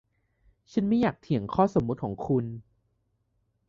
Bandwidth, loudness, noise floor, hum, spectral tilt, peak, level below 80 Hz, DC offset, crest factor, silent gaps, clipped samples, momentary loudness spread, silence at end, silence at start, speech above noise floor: 7.2 kHz; -27 LUFS; -74 dBFS; none; -8.5 dB/octave; -10 dBFS; -56 dBFS; under 0.1%; 20 dB; none; under 0.1%; 8 LU; 1.05 s; 0.75 s; 47 dB